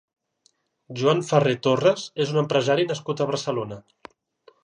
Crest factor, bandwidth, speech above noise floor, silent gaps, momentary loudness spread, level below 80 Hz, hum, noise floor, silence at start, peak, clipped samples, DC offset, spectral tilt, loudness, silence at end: 20 dB; 10.5 kHz; 44 dB; none; 10 LU; -68 dBFS; none; -66 dBFS; 0.9 s; -4 dBFS; under 0.1%; under 0.1%; -5.5 dB/octave; -23 LUFS; 0.85 s